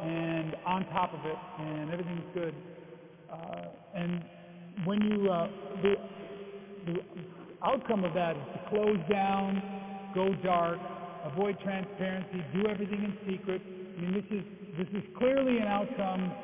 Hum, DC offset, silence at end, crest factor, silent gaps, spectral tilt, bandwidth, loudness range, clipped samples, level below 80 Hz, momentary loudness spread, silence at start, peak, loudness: none; under 0.1%; 0 s; 24 dB; none; -5.5 dB/octave; 3.8 kHz; 6 LU; under 0.1%; -66 dBFS; 15 LU; 0 s; -10 dBFS; -33 LUFS